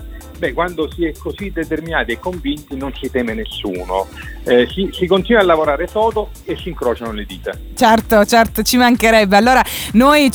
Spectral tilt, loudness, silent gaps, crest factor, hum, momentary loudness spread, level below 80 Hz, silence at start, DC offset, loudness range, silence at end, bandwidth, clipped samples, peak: -4.5 dB/octave; -15 LUFS; none; 14 dB; none; 15 LU; -32 dBFS; 0 s; under 0.1%; 8 LU; 0 s; over 20 kHz; under 0.1%; 0 dBFS